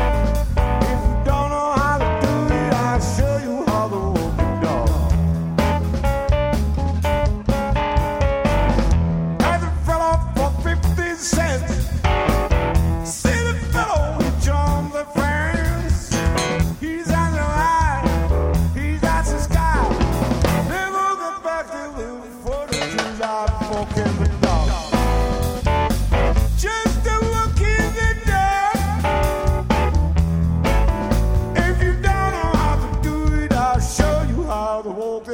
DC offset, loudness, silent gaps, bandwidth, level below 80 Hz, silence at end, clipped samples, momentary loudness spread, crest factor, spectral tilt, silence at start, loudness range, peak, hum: under 0.1%; -20 LUFS; none; 16.5 kHz; -22 dBFS; 0 s; under 0.1%; 4 LU; 18 dB; -6 dB/octave; 0 s; 2 LU; -2 dBFS; none